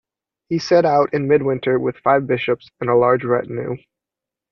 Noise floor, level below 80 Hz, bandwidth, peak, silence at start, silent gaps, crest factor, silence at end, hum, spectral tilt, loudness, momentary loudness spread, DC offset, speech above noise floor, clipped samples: -87 dBFS; -56 dBFS; 7 kHz; -4 dBFS; 0.5 s; none; 16 dB; 0.75 s; none; -7 dB/octave; -18 LUFS; 11 LU; under 0.1%; 69 dB; under 0.1%